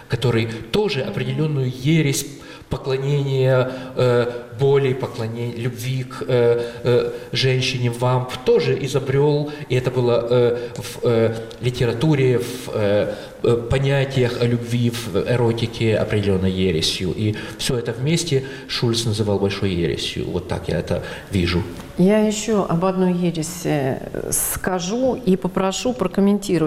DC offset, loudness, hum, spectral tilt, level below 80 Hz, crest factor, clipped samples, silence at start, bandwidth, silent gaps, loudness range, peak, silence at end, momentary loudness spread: under 0.1%; -20 LUFS; none; -5.5 dB/octave; -44 dBFS; 12 dB; under 0.1%; 0 s; 16 kHz; none; 2 LU; -8 dBFS; 0 s; 8 LU